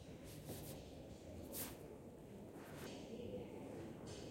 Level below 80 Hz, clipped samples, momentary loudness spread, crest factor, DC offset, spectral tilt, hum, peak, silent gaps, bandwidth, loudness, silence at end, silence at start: -68 dBFS; under 0.1%; 8 LU; 18 dB; under 0.1%; -5 dB/octave; none; -34 dBFS; none; 16.5 kHz; -52 LUFS; 0 s; 0 s